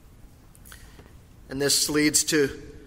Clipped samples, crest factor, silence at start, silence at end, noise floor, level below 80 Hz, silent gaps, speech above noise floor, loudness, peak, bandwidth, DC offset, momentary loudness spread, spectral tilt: under 0.1%; 20 dB; 0.25 s; 0 s; -50 dBFS; -50 dBFS; none; 26 dB; -22 LUFS; -8 dBFS; 16.5 kHz; under 0.1%; 8 LU; -2 dB/octave